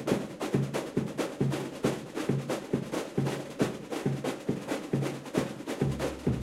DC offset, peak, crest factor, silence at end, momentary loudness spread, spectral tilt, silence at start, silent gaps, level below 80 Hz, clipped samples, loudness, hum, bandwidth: under 0.1%; -12 dBFS; 20 dB; 0 s; 3 LU; -6 dB/octave; 0 s; none; -54 dBFS; under 0.1%; -33 LUFS; none; 15.5 kHz